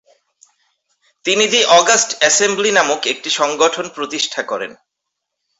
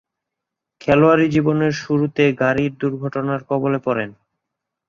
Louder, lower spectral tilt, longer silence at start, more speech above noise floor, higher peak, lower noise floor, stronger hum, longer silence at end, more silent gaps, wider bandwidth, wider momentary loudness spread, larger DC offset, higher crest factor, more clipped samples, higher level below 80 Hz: first, -14 LUFS vs -18 LUFS; second, -0.5 dB/octave vs -7.5 dB/octave; first, 1.25 s vs 0.85 s; about the same, 62 dB vs 65 dB; about the same, 0 dBFS vs -2 dBFS; second, -78 dBFS vs -83 dBFS; neither; about the same, 0.85 s vs 0.75 s; neither; first, 8.2 kHz vs 7.2 kHz; first, 13 LU vs 10 LU; neither; about the same, 18 dB vs 18 dB; neither; second, -64 dBFS vs -52 dBFS